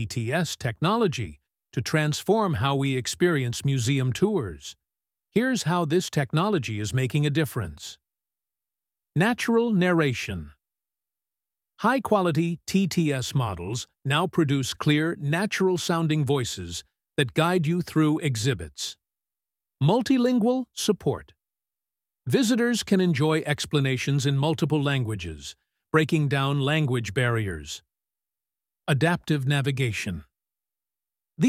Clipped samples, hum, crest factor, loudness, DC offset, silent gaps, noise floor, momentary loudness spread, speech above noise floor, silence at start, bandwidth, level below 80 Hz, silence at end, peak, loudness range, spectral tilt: under 0.1%; none; 18 dB; -25 LUFS; under 0.1%; none; under -90 dBFS; 11 LU; over 66 dB; 0 s; 16 kHz; -54 dBFS; 0 s; -6 dBFS; 2 LU; -5.5 dB/octave